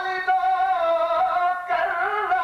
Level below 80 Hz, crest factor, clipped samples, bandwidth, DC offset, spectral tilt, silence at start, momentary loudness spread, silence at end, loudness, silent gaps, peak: -60 dBFS; 10 dB; under 0.1%; 6.8 kHz; under 0.1%; -3 dB/octave; 0 s; 3 LU; 0 s; -22 LUFS; none; -12 dBFS